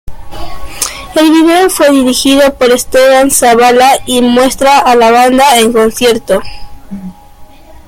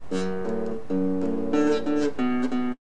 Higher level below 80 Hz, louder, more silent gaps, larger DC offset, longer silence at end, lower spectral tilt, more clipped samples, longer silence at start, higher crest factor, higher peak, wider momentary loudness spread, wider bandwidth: first, -32 dBFS vs -54 dBFS; first, -7 LUFS vs -26 LUFS; neither; second, under 0.1% vs 3%; about the same, 0.1 s vs 0 s; second, -2.5 dB/octave vs -6.5 dB/octave; first, 0.2% vs under 0.1%; about the same, 0.05 s vs 0 s; second, 8 dB vs 14 dB; first, 0 dBFS vs -12 dBFS; first, 20 LU vs 6 LU; first, 17 kHz vs 10 kHz